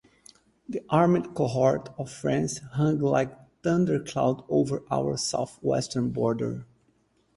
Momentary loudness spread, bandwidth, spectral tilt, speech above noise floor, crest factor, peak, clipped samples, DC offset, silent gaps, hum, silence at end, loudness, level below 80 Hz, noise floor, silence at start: 9 LU; 11.5 kHz; -6 dB/octave; 41 dB; 20 dB; -8 dBFS; under 0.1%; under 0.1%; none; none; 0.7 s; -27 LUFS; -58 dBFS; -67 dBFS; 0.7 s